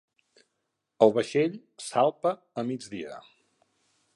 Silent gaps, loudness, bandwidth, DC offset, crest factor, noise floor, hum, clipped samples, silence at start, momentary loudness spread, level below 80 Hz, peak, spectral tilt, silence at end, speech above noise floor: none; -27 LUFS; 11.5 kHz; under 0.1%; 24 dB; -81 dBFS; none; under 0.1%; 1 s; 17 LU; -76 dBFS; -4 dBFS; -5.5 dB/octave; 0.95 s; 54 dB